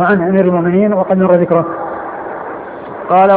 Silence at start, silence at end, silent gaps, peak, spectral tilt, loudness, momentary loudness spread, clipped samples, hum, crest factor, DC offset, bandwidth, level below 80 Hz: 0 s; 0 s; none; 0 dBFS; -12.5 dB/octave; -13 LUFS; 15 LU; under 0.1%; none; 12 dB; under 0.1%; 4.2 kHz; -50 dBFS